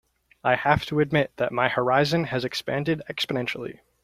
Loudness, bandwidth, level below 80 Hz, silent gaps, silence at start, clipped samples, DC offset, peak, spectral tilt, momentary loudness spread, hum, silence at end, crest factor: -24 LUFS; 15.5 kHz; -52 dBFS; none; 0.45 s; under 0.1%; under 0.1%; -4 dBFS; -6 dB/octave; 7 LU; none; 0.3 s; 22 dB